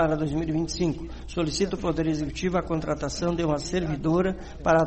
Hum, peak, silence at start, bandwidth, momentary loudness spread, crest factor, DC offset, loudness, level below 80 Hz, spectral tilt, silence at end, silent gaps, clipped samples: none; -10 dBFS; 0 s; 8.8 kHz; 5 LU; 16 dB; 0.3%; -27 LUFS; -40 dBFS; -6 dB/octave; 0 s; none; under 0.1%